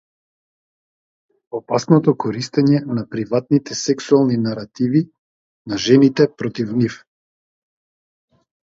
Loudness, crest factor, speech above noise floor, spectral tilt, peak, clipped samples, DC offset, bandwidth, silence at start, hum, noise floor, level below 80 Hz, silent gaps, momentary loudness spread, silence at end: -18 LUFS; 18 dB; over 73 dB; -6.5 dB/octave; 0 dBFS; under 0.1%; under 0.1%; 7.8 kHz; 1.55 s; none; under -90 dBFS; -60 dBFS; 5.18-5.65 s; 10 LU; 1.65 s